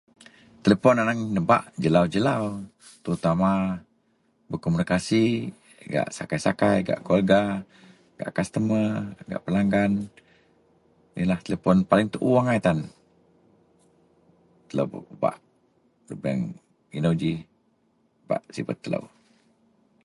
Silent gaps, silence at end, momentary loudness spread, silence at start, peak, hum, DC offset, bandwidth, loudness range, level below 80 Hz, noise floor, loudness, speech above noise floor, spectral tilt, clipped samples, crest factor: none; 0.95 s; 14 LU; 0.65 s; -4 dBFS; none; under 0.1%; 11.5 kHz; 7 LU; -54 dBFS; -67 dBFS; -24 LUFS; 43 dB; -7 dB/octave; under 0.1%; 22 dB